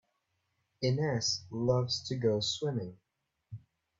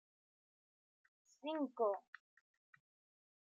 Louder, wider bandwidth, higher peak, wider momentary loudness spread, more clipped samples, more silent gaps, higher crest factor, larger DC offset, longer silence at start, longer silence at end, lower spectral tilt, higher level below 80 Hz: first, -32 LUFS vs -42 LUFS; about the same, 7.8 kHz vs 7.6 kHz; first, -16 dBFS vs -26 dBFS; about the same, 21 LU vs 23 LU; neither; neither; about the same, 18 dB vs 22 dB; neither; second, 0.8 s vs 1.45 s; second, 0.4 s vs 1.45 s; first, -5 dB/octave vs -2 dB/octave; first, -66 dBFS vs under -90 dBFS